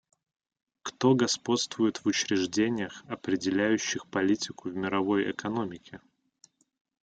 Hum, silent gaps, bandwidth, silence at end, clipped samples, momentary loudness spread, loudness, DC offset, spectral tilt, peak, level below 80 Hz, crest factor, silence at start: none; none; 9.2 kHz; 1.05 s; under 0.1%; 11 LU; -28 LUFS; under 0.1%; -4 dB/octave; -10 dBFS; -70 dBFS; 20 dB; 0.85 s